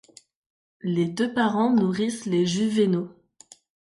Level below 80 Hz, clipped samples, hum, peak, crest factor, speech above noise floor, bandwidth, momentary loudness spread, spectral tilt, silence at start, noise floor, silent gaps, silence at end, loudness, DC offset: -68 dBFS; under 0.1%; none; -10 dBFS; 16 dB; 31 dB; 11.5 kHz; 7 LU; -6 dB/octave; 0.85 s; -54 dBFS; none; 0.8 s; -24 LUFS; under 0.1%